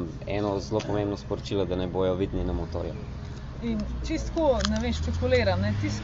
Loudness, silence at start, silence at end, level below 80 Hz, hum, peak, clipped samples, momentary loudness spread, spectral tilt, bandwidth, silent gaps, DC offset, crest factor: -28 LUFS; 0 s; 0 s; -36 dBFS; none; -6 dBFS; under 0.1%; 10 LU; -6 dB/octave; 7.6 kHz; none; under 0.1%; 22 dB